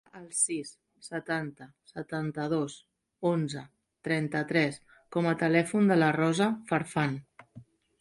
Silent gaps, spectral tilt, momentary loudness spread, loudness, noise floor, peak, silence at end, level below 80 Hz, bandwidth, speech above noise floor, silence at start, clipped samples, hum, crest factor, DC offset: none; -5 dB/octave; 17 LU; -29 LUFS; -54 dBFS; -10 dBFS; 0.4 s; -70 dBFS; 11.5 kHz; 25 dB; 0.15 s; under 0.1%; none; 20 dB; under 0.1%